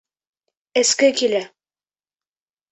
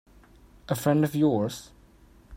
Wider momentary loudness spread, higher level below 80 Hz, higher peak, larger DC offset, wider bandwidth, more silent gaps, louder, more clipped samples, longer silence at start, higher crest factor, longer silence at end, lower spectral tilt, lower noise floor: about the same, 10 LU vs 10 LU; second, -72 dBFS vs -56 dBFS; first, -4 dBFS vs -10 dBFS; neither; second, 8.4 kHz vs 16.5 kHz; neither; first, -18 LUFS vs -26 LUFS; neither; about the same, 0.75 s vs 0.7 s; about the same, 20 dB vs 18 dB; first, 1.25 s vs 0 s; second, -1 dB/octave vs -6.5 dB/octave; first, under -90 dBFS vs -55 dBFS